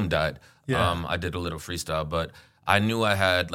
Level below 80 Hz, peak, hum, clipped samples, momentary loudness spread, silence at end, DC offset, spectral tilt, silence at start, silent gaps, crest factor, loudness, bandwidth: -46 dBFS; -2 dBFS; none; under 0.1%; 10 LU; 0 s; under 0.1%; -5 dB/octave; 0 s; none; 24 dB; -26 LUFS; 16.5 kHz